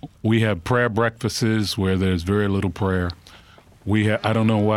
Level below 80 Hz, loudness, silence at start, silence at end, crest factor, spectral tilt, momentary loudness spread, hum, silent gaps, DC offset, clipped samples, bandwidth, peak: -46 dBFS; -21 LUFS; 0.05 s; 0 s; 14 dB; -6 dB/octave; 5 LU; none; none; under 0.1%; under 0.1%; 14.5 kHz; -6 dBFS